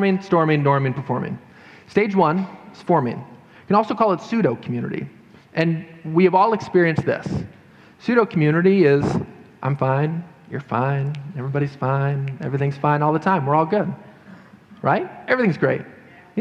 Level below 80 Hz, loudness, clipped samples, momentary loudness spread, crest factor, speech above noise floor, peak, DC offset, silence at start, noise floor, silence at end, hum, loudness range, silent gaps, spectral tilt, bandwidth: -54 dBFS; -20 LUFS; under 0.1%; 13 LU; 18 dB; 25 dB; -4 dBFS; under 0.1%; 0 s; -45 dBFS; 0 s; none; 4 LU; none; -8.5 dB/octave; 8.2 kHz